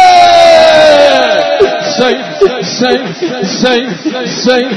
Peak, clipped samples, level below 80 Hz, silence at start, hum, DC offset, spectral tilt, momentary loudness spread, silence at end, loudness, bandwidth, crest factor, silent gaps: 0 dBFS; 5%; -44 dBFS; 0 s; none; under 0.1%; -3.5 dB/octave; 11 LU; 0 s; -8 LUFS; 11 kHz; 8 dB; none